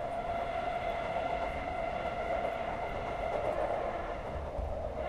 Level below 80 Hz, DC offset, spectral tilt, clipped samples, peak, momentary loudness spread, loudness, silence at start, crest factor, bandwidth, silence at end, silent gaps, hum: -46 dBFS; under 0.1%; -6.5 dB/octave; under 0.1%; -20 dBFS; 5 LU; -36 LUFS; 0 s; 14 dB; 12 kHz; 0 s; none; none